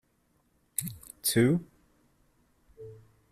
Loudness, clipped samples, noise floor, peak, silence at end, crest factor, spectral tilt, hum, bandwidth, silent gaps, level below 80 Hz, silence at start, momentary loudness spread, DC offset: -29 LUFS; under 0.1%; -71 dBFS; -8 dBFS; 0.4 s; 26 dB; -4.5 dB/octave; none; 15.5 kHz; none; -62 dBFS; 0.8 s; 24 LU; under 0.1%